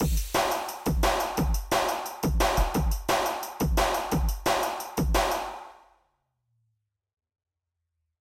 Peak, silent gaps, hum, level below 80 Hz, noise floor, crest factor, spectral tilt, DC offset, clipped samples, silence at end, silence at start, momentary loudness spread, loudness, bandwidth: -12 dBFS; none; none; -32 dBFS; -84 dBFS; 16 dB; -4.5 dB/octave; under 0.1%; under 0.1%; 2.5 s; 0 s; 5 LU; -27 LUFS; 17 kHz